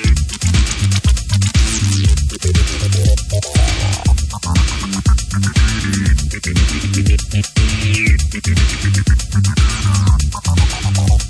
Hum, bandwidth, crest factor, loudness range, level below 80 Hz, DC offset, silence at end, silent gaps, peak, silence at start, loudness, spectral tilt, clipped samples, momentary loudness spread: none; 11 kHz; 12 dB; 1 LU; -16 dBFS; under 0.1%; 0 s; none; -2 dBFS; 0 s; -15 LUFS; -4.5 dB/octave; under 0.1%; 3 LU